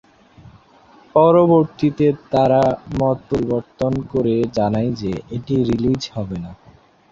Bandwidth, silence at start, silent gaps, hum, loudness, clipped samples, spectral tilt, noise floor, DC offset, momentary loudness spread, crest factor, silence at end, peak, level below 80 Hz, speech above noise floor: 7.6 kHz; 1.15 s; none; none; -18 LUFS; under 0.1%; -8 dB/octave; -49 dBFS; under 0.1%; 12 LU; 16 dB; 0.55 s; -2 dBFS; -44 dBFS; 32 dB